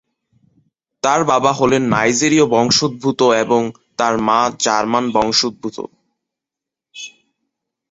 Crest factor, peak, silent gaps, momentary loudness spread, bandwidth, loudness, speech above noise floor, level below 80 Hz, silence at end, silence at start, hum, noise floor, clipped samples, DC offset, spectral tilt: 16 dB; 0 dBFS; none; 16 LU; 8 kHz; -15 LUFS; 70 dB; -52 dBFS; 0.8 s; 1.05 s; none; -85 dBFS; under 0.1%; under 0.1%; -3.5 dB/octave